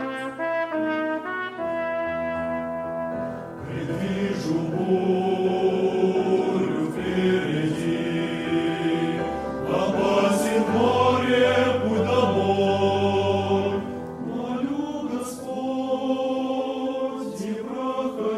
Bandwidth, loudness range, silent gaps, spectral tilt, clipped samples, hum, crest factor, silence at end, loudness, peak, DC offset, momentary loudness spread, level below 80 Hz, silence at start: 14 kHz; 7 LU; none; -6 dB/octave; under 0.1%; none; 16 dB; 0 s; -24 LUFS; -8 dBFS; under 0.1%; 9 LU; -56 dBFS; 0 s